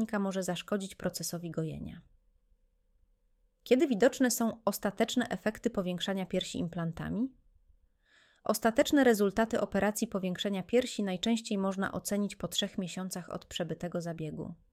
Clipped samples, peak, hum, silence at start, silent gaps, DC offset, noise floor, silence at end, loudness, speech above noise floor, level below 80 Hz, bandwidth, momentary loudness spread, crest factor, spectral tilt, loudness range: under 0.1%; -12 dBFS; none; 0 s; none; under 0.1%; -71 dBFS; 0.2 s; -32 LUFS; 40 dB; -60 dBFS; 16.5 kHz; 12 LU; 20 dB; -4.5 dB/octave; 6 LU